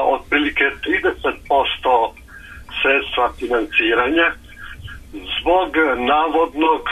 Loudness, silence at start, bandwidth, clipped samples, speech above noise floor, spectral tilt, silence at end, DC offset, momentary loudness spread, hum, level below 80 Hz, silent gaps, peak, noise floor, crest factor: -17 LUFS; 0 s; 13.5 kHz; under 0.1%; 21 dB; -5 dB/octave; 0 s; under 0.1%; 18 LU; none; -40 dBFS; none; -4 dBFS; -38 dBFS; 14 dB